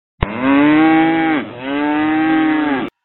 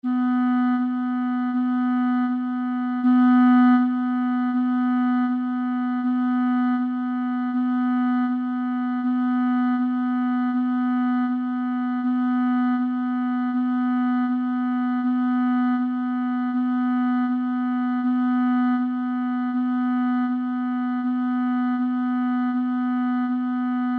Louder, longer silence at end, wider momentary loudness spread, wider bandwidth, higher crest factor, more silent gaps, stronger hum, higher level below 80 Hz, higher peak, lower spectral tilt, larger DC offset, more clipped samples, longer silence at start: first, -15 LUFS vs -23 LUFS; first, 0.15 s vs 0 s; first, 9 LU vs 4 LU; about the same, 4.2 kHz vs 4.3 kHz; about the same, 14 dB vs 14 dB; neither; neither; first, -36 dBFS vs -80 dBFS; first, 0 dBFS vs -8 dBFS; second, -4.5 dB/octave vs -7.5 dB/octave; neither; neither; first, 0.2 s vs 0.05 s